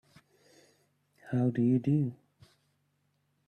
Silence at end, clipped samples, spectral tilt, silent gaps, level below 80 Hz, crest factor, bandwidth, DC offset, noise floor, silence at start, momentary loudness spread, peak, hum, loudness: 1.35 s; under 0.1%; -10 dB/octave; none; -72 dBFS; 16 dB; 8.6 kHz; under 0.1%; -76 dBFS; 1.25 s; 9 LU; -18 dBFS; none; -30 LUFS